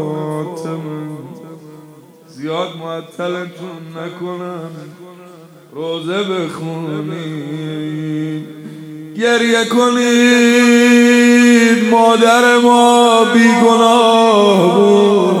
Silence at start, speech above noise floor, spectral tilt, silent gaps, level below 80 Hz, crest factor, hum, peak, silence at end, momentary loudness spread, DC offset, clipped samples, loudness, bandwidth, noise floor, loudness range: 0 s; 28 dB; -4.5 dB/octave; none; -68 dBFS; 12 dB; none; 0 dBFS; 0 s; 20 LU; under 0.1%; under 0.1%; -11 LUFS; 15 kHz; -40 dBFS; 16 LU